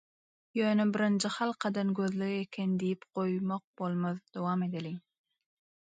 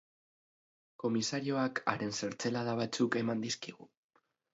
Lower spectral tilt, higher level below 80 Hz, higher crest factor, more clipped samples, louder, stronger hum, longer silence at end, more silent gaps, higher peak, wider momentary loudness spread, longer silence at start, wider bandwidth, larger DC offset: first, -6 dB/octave vs -4 dB/octave; about the same, -78 dBFS vs -76 dBFS; second, 16 dB vs 24 dB; neither; about the same, -33 LUFS vs -35 LUFS; neither; first, 0.95 s vs 0.65 s; first, 3.64-3.74 s vs none; second, -16 dBFS vs -12 dBFS; about the same, 8 LU vs 6 LU; second, 0.55 s vs 1 s; first, 9.4 kHz vs 7.6 kHz; neither